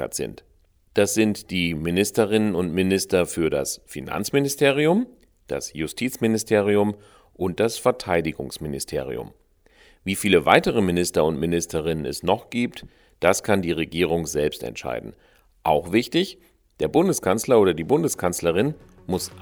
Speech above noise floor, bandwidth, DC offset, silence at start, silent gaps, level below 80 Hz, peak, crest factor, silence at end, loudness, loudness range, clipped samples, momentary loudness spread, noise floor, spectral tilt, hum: 34 dB; over 20 kHz; under 0.1%; 0 s; none; -50 dBFS; 0 dBFS; 22 dB; 0 s; -23 LUFS; 3 LU; under 0.1%; 12 LU; -56 dBFS; -4.5 dB/octave; none